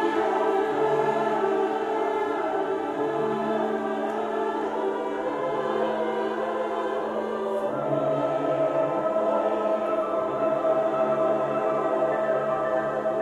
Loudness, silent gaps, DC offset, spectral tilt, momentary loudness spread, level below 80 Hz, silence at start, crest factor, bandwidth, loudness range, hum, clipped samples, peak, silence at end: -26 LUFS; none; under 0.1%; -6.5 dB/octave; 4 LU; -66 dBFS; 0 s; 14 dB; 11.5 kHz; 3 LU; none; under 0.1%; -10 dBFS; 0 s